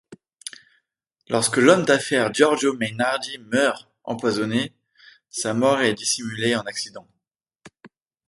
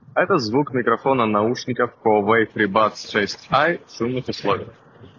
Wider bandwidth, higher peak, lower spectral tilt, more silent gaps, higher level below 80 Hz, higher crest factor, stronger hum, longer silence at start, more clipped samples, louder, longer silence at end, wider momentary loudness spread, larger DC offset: first, 12 kHz vs 7.4 kHz; about the same, -2 dBFS vs -4 dBFS; second, -3.5 dB/octave vs -5.5 dB/octave; neither; second, -66 dBFS vs -56 dBFS; about the same, 22 dB vs 18 dB; neither; about the same, 0.1 s vs 0.15 s; neither; about the same, -21 LUFS vs -20 LUFS; first, 0.4 s vs 0.1 s; first, 16 LU vs 7 LU; neither